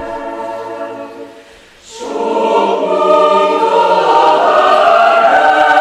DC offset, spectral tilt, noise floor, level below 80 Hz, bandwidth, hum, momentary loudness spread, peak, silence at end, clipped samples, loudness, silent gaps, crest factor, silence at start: under 0.1%; -3.5 dB/octave; -39 dBFS; -52 dBFS; 12 kHz; none; 16 LU; 0 dBFS; 0 s; under 0.1%; -10 LUFS; none; 10 dB; 0 s